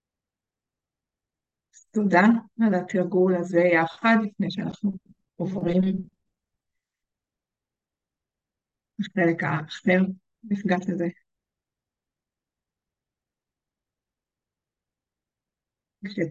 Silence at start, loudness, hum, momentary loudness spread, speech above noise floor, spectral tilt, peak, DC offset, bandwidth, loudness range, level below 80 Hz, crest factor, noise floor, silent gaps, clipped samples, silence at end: 1.95 s; -24 LUFS; none; 12 LU; 66 dB; -7.5 dB/octave; -6 dBFS; under 0.1%; 7.6 kHz; 11 LU; -68 dBFS; 22 dB; -90 dBFS; none; under 0.1%; 0 s